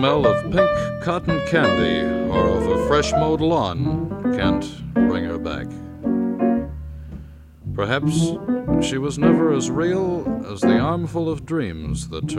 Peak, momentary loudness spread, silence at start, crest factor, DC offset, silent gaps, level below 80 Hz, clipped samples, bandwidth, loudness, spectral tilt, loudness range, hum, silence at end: -4 dBFS; 10 LU; 0 s; 16 dB; under 0.1%; none; -38 dBFS; under 0.1%; 12 kHz; -21 LUFS; -6 dB/octave; 5 LU; none; 0 s